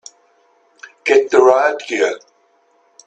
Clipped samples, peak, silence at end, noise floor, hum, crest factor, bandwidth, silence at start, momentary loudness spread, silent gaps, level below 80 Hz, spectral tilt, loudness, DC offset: under 0.1%; 0 dBFS; 0.9 s; -57 dBFS; none; 18 dB; 8.6 kHz; 1.05 s; 12 LU; none; -66 dBFS; -2.5 dB/octave; -14 LUFS; under 0.1%